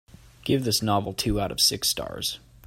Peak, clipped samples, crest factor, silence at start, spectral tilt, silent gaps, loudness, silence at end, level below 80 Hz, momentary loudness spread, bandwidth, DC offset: -8 dBFS; under 0.1%; 18 dB; 0.45 s; -3.5 dB/octave; none; -24 LUFS; 0.3 s; -44 dBFS; 10 LU; 16.5 kHz; under 0.1%